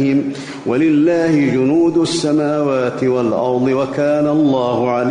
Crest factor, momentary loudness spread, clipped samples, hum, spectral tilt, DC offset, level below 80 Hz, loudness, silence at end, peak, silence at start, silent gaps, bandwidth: 10 dB; 4 LU; under 0.1%; none; -6.5 dB/octave; under 0.1%; -54 dBFS; -15 LUFS; 0 s; -4 dBFS; 0 s; none; 10 kHz